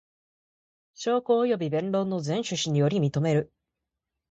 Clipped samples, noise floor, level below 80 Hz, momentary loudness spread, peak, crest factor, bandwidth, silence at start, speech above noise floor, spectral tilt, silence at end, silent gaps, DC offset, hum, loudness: under 0.1%; -85 dBFS; -66 dBFS; 5 LU; -12 dBFS; 16 dB; 8.2 kHz; 1 s; 60 dB; -6 dB/octave; 0.85 s; none; under 0.1%; none; -26 LUFS